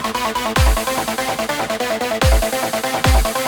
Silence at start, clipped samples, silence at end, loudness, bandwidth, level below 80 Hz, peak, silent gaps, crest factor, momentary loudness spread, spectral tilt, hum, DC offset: 0 s; under 0.1%; 0 s; -18 LUFS; 19.5 kHz; -22 dBFS; -2 dBFS; none; 16 dB; 5 LU; -4 dB/octave; none; under 0.1%